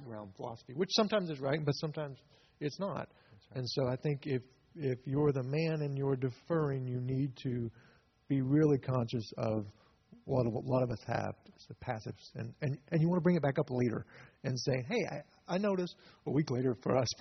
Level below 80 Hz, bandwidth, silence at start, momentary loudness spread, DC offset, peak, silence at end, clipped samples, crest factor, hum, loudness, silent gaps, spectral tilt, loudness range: -68 dBFS; 6.4 kHz; 0 s; 15 LU; under 0.1%; -16 dBFS; 0.05 s; under 0.1%; 18 dB; none; -35 LUFS; none; -6.5 dB/octave; 4 LU